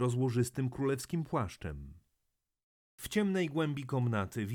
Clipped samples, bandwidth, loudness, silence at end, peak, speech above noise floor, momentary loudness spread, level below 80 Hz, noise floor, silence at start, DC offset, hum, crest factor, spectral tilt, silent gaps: under 0.1%; 19 kHz; -34 LUFS; 0 s; -18 dBFS; 50 dB; 13 LU; -58 dBFS; -83 dBFS; 0 s; under 0.1%; none; 16 dB; -6.5 dB/octave; 2.63-2.98 s